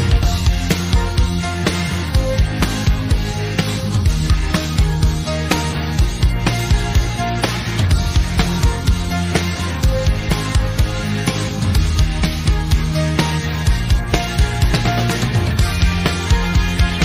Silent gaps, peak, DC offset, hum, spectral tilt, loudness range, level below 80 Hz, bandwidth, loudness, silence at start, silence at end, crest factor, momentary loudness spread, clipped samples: none; -2 dBFS; under 0.1%; none; -5 dB/octave; 1 LU; -20 dBFS; 15.5 kHz; -18 LUFS; 0 s; 0 s; 14 dB; 3 LU; under 0.1%